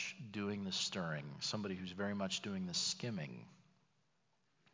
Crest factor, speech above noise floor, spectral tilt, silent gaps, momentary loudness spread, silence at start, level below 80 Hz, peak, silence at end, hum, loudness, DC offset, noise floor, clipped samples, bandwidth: 16 dB; 39 dB; -3.5 dB/octave; none; 7 LU; 0 s; -72 dBFS; -26 dBFS; 1.2 s; none; -41 LUFS; under 0.1%; -81 dBFS; under 0.1%; 7.6 kHz